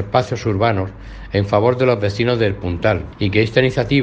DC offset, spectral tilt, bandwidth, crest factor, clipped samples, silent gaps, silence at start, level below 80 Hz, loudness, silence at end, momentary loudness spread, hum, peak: under 0.1%; -7 dB/octave; 8 kHz; 18 dB; under 0.1%; none; 0 s; -38 dBFS; -18 LUFS; 0 s; 7 LU; none; 0 dBFS